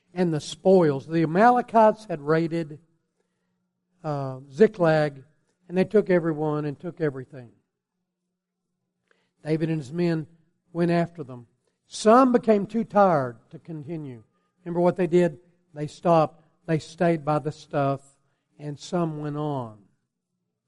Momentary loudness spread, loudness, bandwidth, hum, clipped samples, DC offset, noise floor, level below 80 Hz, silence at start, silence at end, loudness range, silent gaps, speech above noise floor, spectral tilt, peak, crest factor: 18 LU; -23 LUFS; 11.5 kHz; none; under 0.1%; under 0.1%; -82 dBFS; -66 dBFS; 0.15 s; 0.95 s; 9 LU; none; 59 dB; -7.5 dB/octave; -6 dBFS; 20 dB